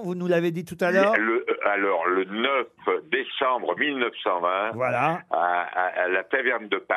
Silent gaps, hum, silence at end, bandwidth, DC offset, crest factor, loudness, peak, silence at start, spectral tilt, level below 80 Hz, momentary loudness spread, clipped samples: none; none; 0 s; 13.5 kHz; under 0.1%; 20 dB; -24 LUFS; -6 dBFS; 0 s; -6 dB/octave; -74 dBFS; 5 LU; under 0.1%